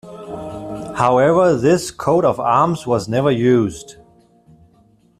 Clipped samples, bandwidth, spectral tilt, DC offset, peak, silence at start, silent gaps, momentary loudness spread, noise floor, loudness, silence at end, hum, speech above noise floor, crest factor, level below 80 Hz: under 0.1%; 14 kHz; -6.5 dB/octave; under 0.1%; -2 dBFS; 0.05 s; none; 16 LU; -54 dBFS; -16 LUFS; 1.3 s; none; 38 dB; 16 dB; -50 dBFS